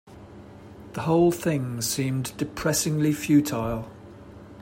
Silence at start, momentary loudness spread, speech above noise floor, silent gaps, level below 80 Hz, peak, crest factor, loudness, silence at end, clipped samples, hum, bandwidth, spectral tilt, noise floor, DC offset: 0.05 s; 24 LU; 21 dB; none; -52 dBFS; -8 dBFS; 16 dB; -25 LUFS; 0 s; under 0.1%; none; 16.5 kHz; -5 dB/octave; -45 dBFS; under 0.1%